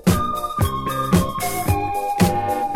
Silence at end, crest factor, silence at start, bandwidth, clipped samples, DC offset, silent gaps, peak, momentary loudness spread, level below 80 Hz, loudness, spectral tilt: 0 s; 18 dB; 0.05 s; 17 kHz; under 0.1%; under 0.1%; none; -2 dBFS; 4 LU; -34 dBFS; -21 LUFS; -5.5 dB/octave